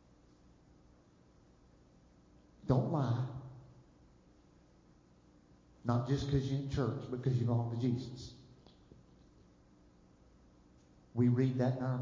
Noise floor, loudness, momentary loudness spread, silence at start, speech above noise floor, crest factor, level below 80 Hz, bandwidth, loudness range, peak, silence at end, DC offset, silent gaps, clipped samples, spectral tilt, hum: -65 dBFS; -35 LUFS; 18 LU; 2.65 s; 31 dB; 22 dB; -58 dBFS; 7.4 kHz; 6 LU; -16 dBFS; 0 s; under 0.1%; none; under 0.1%; -8.5 dB/octave; 60 Hz at -60 dBFS